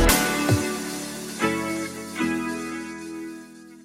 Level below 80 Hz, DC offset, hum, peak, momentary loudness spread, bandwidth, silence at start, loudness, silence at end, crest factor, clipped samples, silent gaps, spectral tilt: -36 dBFS; under 0.1%; none; -4 dBFS; 15 LU; 16.5 kHz; 0 s; -26 LUFS; 0 s; 22 dB; under 0.1%; none; -4 dB/octave